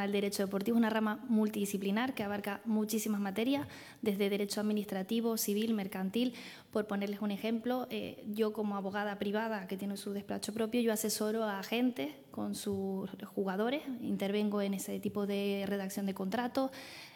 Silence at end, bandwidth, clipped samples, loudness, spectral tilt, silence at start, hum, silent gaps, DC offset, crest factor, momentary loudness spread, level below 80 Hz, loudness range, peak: 0 s; 19 kHz; under 0.1%; -35 LUFS; -5 dB/octave; 0 s; none; none; under 0.1%; 16 dB; 7 LU; -78 dBFS; 3 LU; -20 dBFS